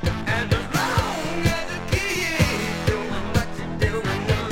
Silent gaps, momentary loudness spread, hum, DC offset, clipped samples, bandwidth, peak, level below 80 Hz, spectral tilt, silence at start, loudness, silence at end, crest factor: none; 4 LU; none; under 0.1%; under 0.1%; 17 kHz; -6 dBFS; -34 dBFS; -5 dB/octave; 0 s; -23 LUFS; 0 s; 18 dB